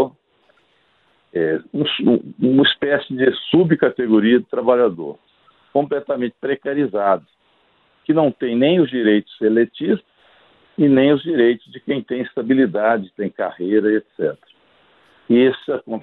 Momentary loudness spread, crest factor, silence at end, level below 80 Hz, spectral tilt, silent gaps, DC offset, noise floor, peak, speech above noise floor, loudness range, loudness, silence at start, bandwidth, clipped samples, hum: 10 LU; 18 dB; 0 s; -62 dBFS; -10 dB/octave; none; under 0.1%; -60 dBFS; 0 dBFS; 43 dB; 4 LU; -18 LUFS; 0 s; 4.3 kHz; under 0.1%; none